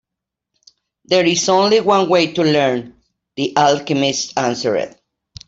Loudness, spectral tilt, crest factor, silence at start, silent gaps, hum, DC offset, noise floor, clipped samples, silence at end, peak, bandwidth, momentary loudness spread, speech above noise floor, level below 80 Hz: -16 LUFS; -4 dB/octave; 16 dB; 1.1 s; none; none; under 0.1%; -83 dBFS; under 0.1%; 0.6 s; -2 dBFS; 8 kHz; 10 LU; 67 dB; -58 dBFS